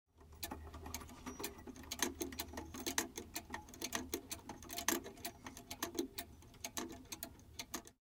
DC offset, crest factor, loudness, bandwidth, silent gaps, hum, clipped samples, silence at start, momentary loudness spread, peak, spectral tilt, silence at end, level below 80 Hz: under 0.1%; 30 dB; -45 LUFS; 18 kHz; none; none; under 0.1%; 0.15 s; 11 LU; -16 dBFS; -2 dB/octave; 0.15 s; -62 dBFS